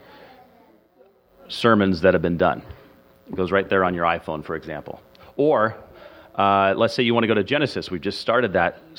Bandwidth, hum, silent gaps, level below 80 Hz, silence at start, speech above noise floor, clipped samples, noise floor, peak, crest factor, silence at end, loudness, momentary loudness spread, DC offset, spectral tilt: 16 kHz; none; none; -52 dBFS; 1.5 s; 35 dB; under 0.1%; -56 dBFS; -2 dBFS; 20 dB; 0.2 s; -21 LUFS; 16 LU; under 0.1%; -6.5 dB/octave